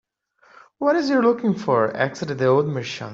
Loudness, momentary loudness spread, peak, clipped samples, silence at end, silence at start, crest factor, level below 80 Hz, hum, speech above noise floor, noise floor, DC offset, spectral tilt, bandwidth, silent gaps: -21 LUFS; 6 LU; -4 dBFS; under 0.1%; 0 s; 0.8 s; 16 dB; -64 dBFS; none; 38 dB; -58 dBFS; under 0.1%; -6.5 dB/octave; 7.8 kHz; none